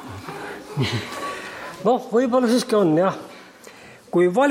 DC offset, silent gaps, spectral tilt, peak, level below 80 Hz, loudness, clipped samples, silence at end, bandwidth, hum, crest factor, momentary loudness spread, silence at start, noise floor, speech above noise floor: under 0.1%; none; -6 dB/octave; -6 dBFS; -60 dBFS; -21 LUFS; under 0.1%; 0 s; 16.5 kHz; none; 14 dB; 16 LU; 0 s; -44 dBFS; 25 dB